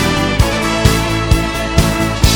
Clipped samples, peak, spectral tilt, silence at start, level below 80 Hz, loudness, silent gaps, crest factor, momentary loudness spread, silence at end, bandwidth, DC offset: 0.4%; 0 dBFS; -4.5 dB/octave; 0 s; -20 dBFS; -14 LUFS; none; 14 dB; 2 LU; 0 s; over 20 kHz; under 0.1%